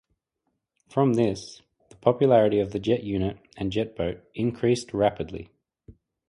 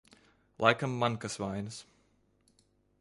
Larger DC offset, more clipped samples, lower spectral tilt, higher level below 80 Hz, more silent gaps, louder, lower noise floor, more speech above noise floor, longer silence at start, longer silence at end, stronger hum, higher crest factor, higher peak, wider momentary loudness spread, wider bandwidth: neither; neither; first, -7 dB/octave vs -5 dB/octave; first, -52 dBFS vs -66 dBFS; neither; first, -25 LUFS vs -32 LUFS; first, -79 dBFS vs -70 dBFS; first, 54 dB vs 39 dB; first, 0.95 s vs 0.6 s; second, 0.35 s vs 1.2 s; second, none vs 50 Hz at -60 dBFS; second, 20 dB vs 26 dB; about the same, -6 dBFS vs -8 dBFS; about the same, 15 LU vs 14 LU; about the same, 11.5 kHz vs 11.5 kHz